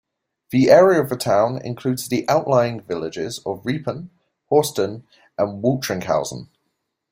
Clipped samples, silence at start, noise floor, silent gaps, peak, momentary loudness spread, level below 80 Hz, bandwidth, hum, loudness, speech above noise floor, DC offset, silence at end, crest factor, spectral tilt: under 0.1%; 0.5 s; -75 dBFS; none; -2 dBFS; 14 LU; -58 dBFS; 16.5 kHz; none; -20 LUFS; 55 dB; under 0.1%; 0.65 s; 18 dB; -5.5 dB/octave